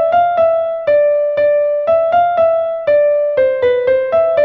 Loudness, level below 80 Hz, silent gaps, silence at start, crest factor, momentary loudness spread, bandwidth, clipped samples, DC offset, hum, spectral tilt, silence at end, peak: -13 LUFS; -52 dBFS; none; 0 s; 10 dB; 2 LU; 4.9 kHz; under 0.1%; under 0.1%; none; -6.5 dB/octave; 0 s; -2 dBFS